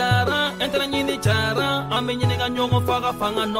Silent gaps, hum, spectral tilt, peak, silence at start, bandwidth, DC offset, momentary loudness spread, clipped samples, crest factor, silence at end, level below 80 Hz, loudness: none; none; -5 dB/octave; -8 dBFS; 0 s; 16 kHz; under 0.1%; 3 LU; under 0.1%; 14 dB; 0 s; -46 dBFS; -21 LUFS